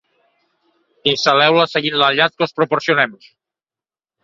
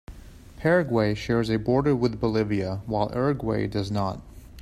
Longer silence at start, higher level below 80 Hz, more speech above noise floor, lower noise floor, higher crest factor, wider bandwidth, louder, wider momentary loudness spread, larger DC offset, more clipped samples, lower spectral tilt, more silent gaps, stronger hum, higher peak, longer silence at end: first, 1.05 s vs 0.1 s; second, -64 dBFS vs -46 dBFS; first, over 74 dB vs 20 dB; first, under -90 dBFS vs -44 dBFS; about the same, 18 dB vs 16 dB; second, 7.6 kHz vs 13.5 kHz; first, -15 LUFS vs -25 LUFS; about the same, 7 LU vs 7 LU; neither; neither; second, -4 dB/octave vs -7.5 dB/octave; neither; neither; first, 0 dBFS vs -8 dBFS; first, 1.1 s vs 0 s